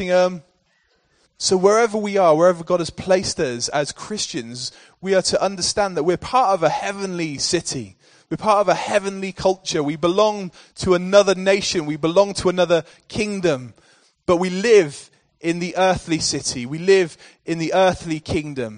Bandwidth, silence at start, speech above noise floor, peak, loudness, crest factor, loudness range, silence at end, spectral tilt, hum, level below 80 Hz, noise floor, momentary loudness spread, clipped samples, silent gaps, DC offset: 10 kHz; 0 s; 44 dB; 0 dBFS; -19 LUFS; 20 dB; 3 LU; 0 s; -4 dB/octave; none; -50 dBFS; -64 dBFS; 12 LU; under 0.1%; none; under 0.1%